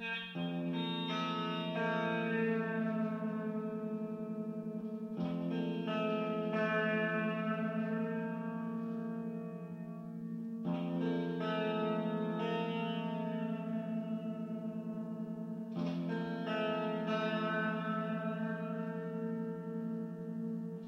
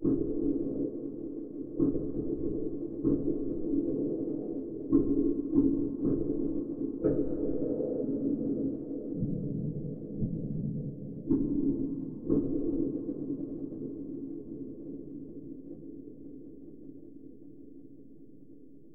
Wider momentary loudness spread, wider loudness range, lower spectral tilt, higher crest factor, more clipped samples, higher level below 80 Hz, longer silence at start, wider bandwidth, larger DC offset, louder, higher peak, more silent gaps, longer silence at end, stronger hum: second, 7 LU vs 18 LU; second, 4 LU vs 14 LU; second, -8 dB/octave vs -14.5 dB/octave; second, 14 dB vs 20 dB; neither; second, -82 dBFS vs -50 dBFS; about the same, 0 s vs 0 s; first, 6.4 kHz vs 1.7 kHz; second, under 0.1% vs 0.3%; second, -38 LUFS vs -33 LUFS; second, -22 dBFS vs -12 dBFS; neither; about the same, 0 s vs 0.05 s; neither